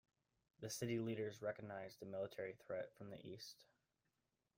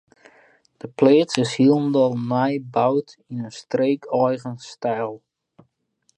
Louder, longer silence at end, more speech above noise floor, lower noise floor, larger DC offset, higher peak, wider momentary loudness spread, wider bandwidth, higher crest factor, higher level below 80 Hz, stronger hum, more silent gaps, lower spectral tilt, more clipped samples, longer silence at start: second, -49 LUFS vs -21 LUFS; about the same, 0.95 s vs 1 s; second, 41 dB vs 48 dB; first, -89 dBFS vs -68 dBFS; neither; second, -32 dBFS vs 0 dBFS; second, 12 LU vs 16 LU; first, 16 kHz vs 10.5 kHz; about the same, 18 dB vs 22 dB; second, -84 dBFS vs -70 dBFS; neither; neither; second, -5 dB/octave vs -6.5 dB/octave; neither; second, 0.6 s vs 0.85 s